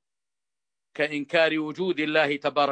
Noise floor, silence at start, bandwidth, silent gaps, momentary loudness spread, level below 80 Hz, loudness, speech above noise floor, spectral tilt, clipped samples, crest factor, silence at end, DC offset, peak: under -90 dBFS; 0.95 s; 9 kHz; none; 6 LU; -76 dBFS; -25 LUFS; over 66 dB; -5.5 dB/octave; under 0.1%; 20 dB; 0 s; under 0.1%; -8 dBFS